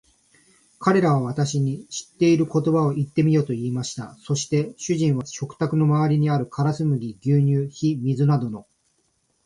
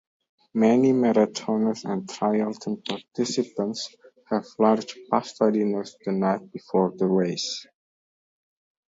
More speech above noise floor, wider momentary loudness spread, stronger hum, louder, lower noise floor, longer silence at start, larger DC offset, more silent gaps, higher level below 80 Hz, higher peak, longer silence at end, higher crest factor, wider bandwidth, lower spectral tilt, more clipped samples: second, 47 dB vs over 66 dB; second, 8 LU vs 11 LU; neither; first, -22 LUFS vs -25 LUFS; second, -68 dBFS vs under -90 dBFS; first, 0.8 s vs 0.55 s; neither; neither; first, -60 dBFS vs -72 dBFS; about the same, -4 dBFS vs -6 dBFS; second, 0.85 s vs 1.25 s; about the same, 18 dB vs 20 dB; first, 11 kHz vs 7.8 kHz; first, -7 dB/octave vs -5.5 dB/octave; neither